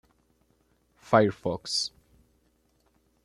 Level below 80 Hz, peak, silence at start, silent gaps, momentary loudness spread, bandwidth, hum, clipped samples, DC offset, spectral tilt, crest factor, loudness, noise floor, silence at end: -64 dBFS; -6 dBFS; 1.1 s; none; 10 LU; 13 kHz; none; under 0.1%; under 0.1%; -4.5 dB/octave; 26 dB; -26 LUFS; -69 dBFS; 1.35 s